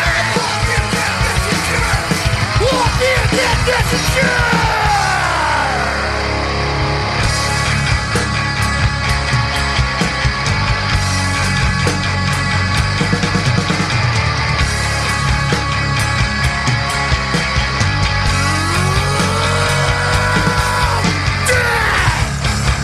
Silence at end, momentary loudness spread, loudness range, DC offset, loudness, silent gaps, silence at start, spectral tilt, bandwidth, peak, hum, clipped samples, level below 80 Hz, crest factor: 0 s; 3 LU; 2 LU; under 0.1%; -15 LUFS; none; 0 s; -4 dB/octave; 14 kHz; -2 dBFS; none; under 0.1%; -24 dBFS; 12 dB